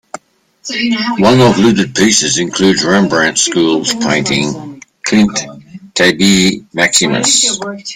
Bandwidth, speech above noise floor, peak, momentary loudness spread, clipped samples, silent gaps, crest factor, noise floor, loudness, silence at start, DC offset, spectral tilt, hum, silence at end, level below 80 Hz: 16.5 kHz; 32 dB; 0 dBFS; 12 LU; under 0.1%; none; 12 dB; -43 dBFS; -11 LUFS; 0.65 s; under 0.1%; -3.5 dB/octave; none; 0 s; -46 dBFS